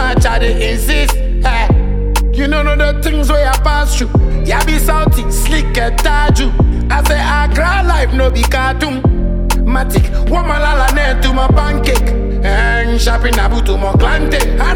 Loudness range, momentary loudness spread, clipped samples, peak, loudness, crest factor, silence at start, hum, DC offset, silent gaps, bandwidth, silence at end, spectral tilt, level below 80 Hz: 1 LU; 3 LU; under 0.1%; 0 dBFS; -13 LUFS; 10 dB; 0 s; none; under 0.1%; none; 16.5 kHz; 0 s; -5 dB/octave; -12 dBFS